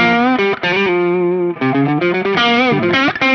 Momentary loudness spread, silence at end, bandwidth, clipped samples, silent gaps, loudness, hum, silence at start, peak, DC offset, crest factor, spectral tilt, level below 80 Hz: 4 LU; 0 s; 6.6 kHz; under 0.1%; none; -14 LUFS; none; 0 s; -2 dBFS; under 0.1%; 12 dB; -6 dB/octave; -54 dBFS